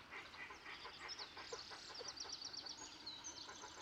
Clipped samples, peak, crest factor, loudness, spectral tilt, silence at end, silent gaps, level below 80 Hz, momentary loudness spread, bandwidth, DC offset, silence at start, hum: under 0.1%; -36 dBFS; 16 dB; -50 LUFS; -0.5 dB/octave; 0 s; none; -76 dBFS; 5 LU; 16 kHz; under 0.1%; 0 s; none